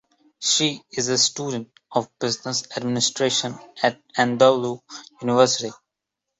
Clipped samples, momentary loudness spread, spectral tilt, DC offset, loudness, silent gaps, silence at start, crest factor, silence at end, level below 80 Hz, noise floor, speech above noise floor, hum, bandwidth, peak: under 0.1%; 12 LU; -3 dB/octave; under 0.1%; -22 LUFS; none; 0.4 s; 20 dB; 0.65 s; -68 dBFS; -83 dBFS; 61 dB; none; 8.2 kHz; -4 dBFS